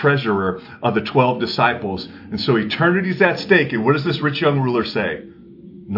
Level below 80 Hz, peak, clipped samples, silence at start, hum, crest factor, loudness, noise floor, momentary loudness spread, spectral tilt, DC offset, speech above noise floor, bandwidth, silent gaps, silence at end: -56 dBFS; -2 dBFS; under 0.1%; 0 s; none; 18 dB; -18 LUFS; -40 dBFS; 9 LU; -7.5 dB/octave; under 0.1%; 22 dB; 5.8 kHz; none; 0 s